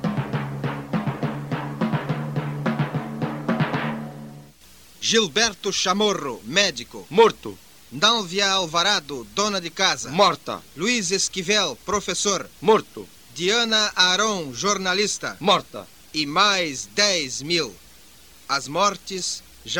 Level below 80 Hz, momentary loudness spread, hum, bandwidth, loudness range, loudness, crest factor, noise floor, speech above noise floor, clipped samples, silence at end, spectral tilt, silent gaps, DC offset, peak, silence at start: -56 dBFS; 12 LU; none; 19 kHz; 6 LU; -22 LUFS; 22 dB; -50 dBFS; 28 dB; under 0.1%; 0 s; -3 dB/octave; none; 0.2%; -2 dBFS; 0 s